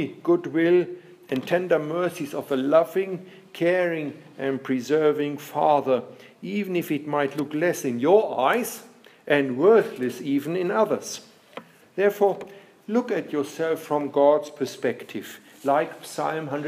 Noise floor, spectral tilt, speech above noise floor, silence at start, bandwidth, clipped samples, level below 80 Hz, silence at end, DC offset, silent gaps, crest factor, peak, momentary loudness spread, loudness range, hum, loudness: -45 dBFS; -5.5 dB/octave; 21 dB; 0 s; 15.5 kHz; under 0.1%; -80 dBFS; 0 s; under 0.1%; none; 20 dB; -4 dBFS; 16 LU; 3 LU; none; -24 LUFS